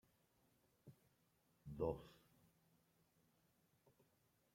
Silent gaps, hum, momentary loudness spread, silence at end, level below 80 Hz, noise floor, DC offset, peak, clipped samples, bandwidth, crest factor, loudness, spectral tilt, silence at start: none; none; 23 LU; 2.4 s; -72 dBFS; -81 dBFS; under 0.1%; -30 dBFS; under 0.1%; 16.5 kHz; 26 dB; -48 LUFS; -8 dB/octave; 0.85 s